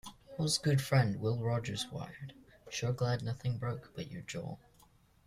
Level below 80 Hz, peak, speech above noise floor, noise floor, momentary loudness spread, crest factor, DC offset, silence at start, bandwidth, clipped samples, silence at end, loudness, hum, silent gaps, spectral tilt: -62 dBFS; -16 dBFS; 31 dB; -65 dBFS; 16 LU; 18 dB; under 0.1%; 0.05 s; 15 kHz; under 0.1%; 0.7 s; -35 LUFS; none; none; -5 dB/octave